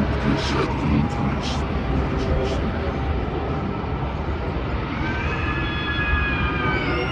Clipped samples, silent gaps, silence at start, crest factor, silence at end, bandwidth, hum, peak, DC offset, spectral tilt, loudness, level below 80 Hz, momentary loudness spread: under 0.1%; none; 0 s; 14 dB; 0 s; 8.8 kHz; none; -8 dBFS; under 0.1%; -6.5 dB/octave; -23 LUFS; -28 dBFS; 5 LU